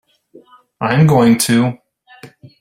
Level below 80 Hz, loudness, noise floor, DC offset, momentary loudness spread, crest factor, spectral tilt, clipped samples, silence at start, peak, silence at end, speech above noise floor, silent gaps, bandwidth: -50 dBFS; -13 LUFS; -46 dBFS; under 0.1%; 10 LU; 16 dB; -5.5 dB/octave; under 0.1%; 0.8 s; 0 dBFS; 0.35 s; 35 dB; none; 16 kHz